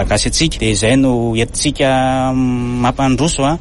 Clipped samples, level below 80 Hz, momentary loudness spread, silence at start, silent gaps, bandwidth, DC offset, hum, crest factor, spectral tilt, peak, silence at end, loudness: under 0.1%; -26 dBFS; 4 LU; 0 s; none; 11.5 kHz; under 0.1%; none; 12 dB; -4.5 dB/octave; -2 dBFS; 0 s; -14 LUFS